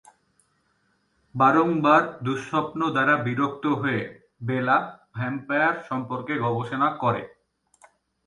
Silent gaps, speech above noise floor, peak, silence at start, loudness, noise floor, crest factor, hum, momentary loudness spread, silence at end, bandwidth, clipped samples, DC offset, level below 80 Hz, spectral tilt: none; 45 dB; -6 dBFS; 1.35 s; -24 LUFS; -69 dBFS; 20 dB; none; 12 LU; 1 s; 11 kHz; under 0.1%; under 0.1%; -66 dBFS; -7 dB/octave